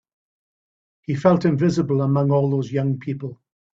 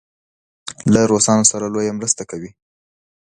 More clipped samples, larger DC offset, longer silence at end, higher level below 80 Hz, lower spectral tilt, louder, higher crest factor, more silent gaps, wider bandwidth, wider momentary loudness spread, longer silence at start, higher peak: neither; neither; second, 0.4 s vs 0.85 s; second, -58 dBFS vs -50 dBFS; first, -8.5 dB/octave vs -4 dB/octave; second, -20 LUFS vs -16 LUFS; about the same, 20 dB vs 18 dB; neither; second, 7.6 kHz vs 11.5 kHz; second, 13 LU vs 21 LU; first, 1.1 s vs 0.65 s; about the same, -2 dBFS vs 0 dBFS